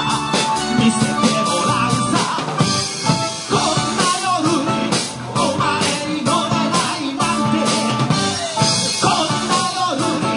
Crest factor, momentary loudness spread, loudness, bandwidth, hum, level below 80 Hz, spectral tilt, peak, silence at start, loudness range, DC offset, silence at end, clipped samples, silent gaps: 16 dB; 3 LU; -17 LUFS; 11 kHz; none; -50 dBFS; -3.5 dB/octave; -2 dBFS; 0 s; 1 LU; under 0.1%; 0 s; under 0.1%; none